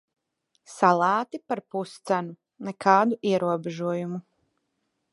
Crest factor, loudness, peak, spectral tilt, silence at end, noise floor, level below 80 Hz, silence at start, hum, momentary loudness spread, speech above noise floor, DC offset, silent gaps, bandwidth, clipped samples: 22 dB; -25 LUFS; -4 dBFS; -6 dB/octave; 0.9 s; -77 dBFS; -78 dBFS; 0.7 s; none; 17 LU; 52 dB; under 0.1%; none; 11.5 kHz; under 0.1%